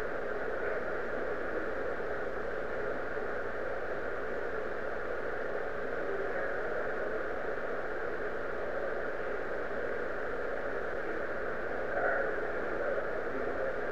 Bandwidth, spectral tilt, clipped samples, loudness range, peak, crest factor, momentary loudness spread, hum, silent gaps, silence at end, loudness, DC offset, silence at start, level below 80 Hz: 11.5 kHz; -6 dB/octave; under 0.1%; 2 LU; -18 dBFS; 16 dB; 3 LU; 60 Hz at -55 dBFS; none; 0 s; -36 LUFS; 1%; 0 s; -54 dBFS